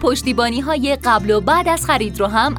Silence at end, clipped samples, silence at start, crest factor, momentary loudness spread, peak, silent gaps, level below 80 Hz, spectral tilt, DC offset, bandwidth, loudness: 0 s; under 0.1%; 0 s; 14 dB; 3 LU; -2 dBFS; none; -34 dBFS; -4 dB/octave; under 0.1%; 19 kHz; -16 LUFS